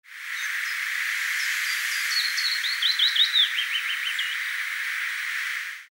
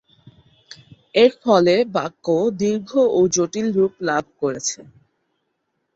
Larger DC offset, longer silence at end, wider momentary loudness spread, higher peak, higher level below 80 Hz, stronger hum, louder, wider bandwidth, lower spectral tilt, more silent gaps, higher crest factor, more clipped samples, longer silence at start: neither; second, 0.1 s vs 1.15 s; about the same, 9 LU vs 9 LU; second, -10 dBFS vs -2 dBFS; second, under -90 dBFS vs -62 dBFS; neither; second, -23 LUFS vs -19 LUFS; first, over 20 kHz vs 8 kHz; second, 12 dB/octave vs -4.5 dB/octave; neither; about the same, 16 dB vs 18 dB; neither; second, 0.05 s vs 1.15 s